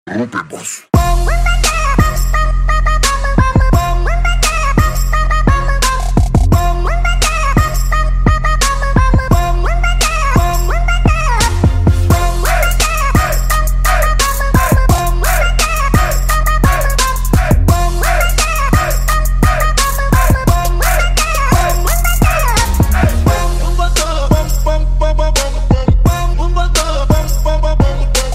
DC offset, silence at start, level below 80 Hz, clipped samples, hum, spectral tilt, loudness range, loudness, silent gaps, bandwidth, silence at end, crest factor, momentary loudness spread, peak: under 0.1%; 0.05 s; -14 dBFS; under 0.1%; none; -4.5 dB/octave; 1 LU; -13 LUFS; none; 16.5 kHz; 0 s; 10 dB; 3 LU; 0 dBFS